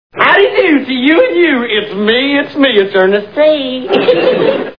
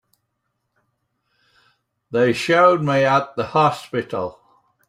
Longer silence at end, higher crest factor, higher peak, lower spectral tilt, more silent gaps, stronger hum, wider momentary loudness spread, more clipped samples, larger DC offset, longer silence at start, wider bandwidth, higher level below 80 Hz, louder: second, 0.05 s vs 0.55 s; second, 10 dB vs 18 dB; about the same, 0 dBFS vs -2 dBFS; about the same, -7 dB/octave vs -6 dB/octave; neither; neither; second, 5 LU vs 12 LU; first, 0.3% vs under 0.1%; first, 0.4% vs under 0.1%; second, 0.15 s vs 2.1 s; second, 5.4 kHz vs 14.5 kHz; first, -50 dBFS vs -62 dBFS; first, -10 LUFS vs -18 LUFS